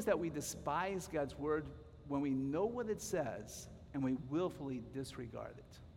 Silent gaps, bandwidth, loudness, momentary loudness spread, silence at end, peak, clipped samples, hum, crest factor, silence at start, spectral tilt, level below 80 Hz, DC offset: none; 16 kHz; -40 LUFS; 12 LU; 0 s; -22 dBFS; under 0.1%; none; 18 dB; 0 s; -5.5 dB/octave; -62 dBFS; under 0.1%